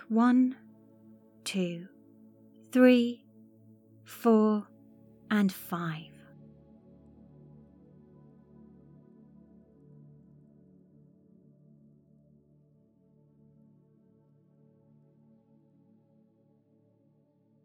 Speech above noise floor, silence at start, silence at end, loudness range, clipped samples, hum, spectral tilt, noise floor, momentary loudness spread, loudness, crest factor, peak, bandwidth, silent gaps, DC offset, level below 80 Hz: 41 dB; 0.1 s; 11.6 s; 9 LU; under 0.1%; none; -6.5 dB/octave; -67 dBFS; 27 LU; -28 LUFS; 24 dB; -10 dBFS; 18.5 kHz; none; under 0.1%; -76 dBFS